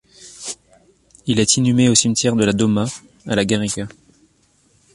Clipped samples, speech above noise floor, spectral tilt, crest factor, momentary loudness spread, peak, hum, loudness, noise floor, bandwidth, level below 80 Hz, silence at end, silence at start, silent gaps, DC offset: under 0.1%; 42 dB; -4 dB/octave; 18 dB; 18 LU; 0 dBFS; none; -17 LUFS; -58 dBFS; 11.5 kHz; -50 dBFS; 1.05 s; 0.2 s; none; under 0.1%